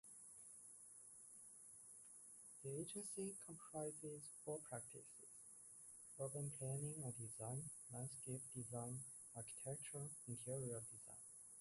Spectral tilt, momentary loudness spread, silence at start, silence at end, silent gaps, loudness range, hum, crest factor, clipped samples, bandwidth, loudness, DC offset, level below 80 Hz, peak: -5 dB/octave; 11 LU; 0.05 s; 0 s; none; 3 LU; none; 16 dB; under 0.1%; 11.5 kHz; -52 LUFS; under 0.1%; -82 dBFS; -36 dBFS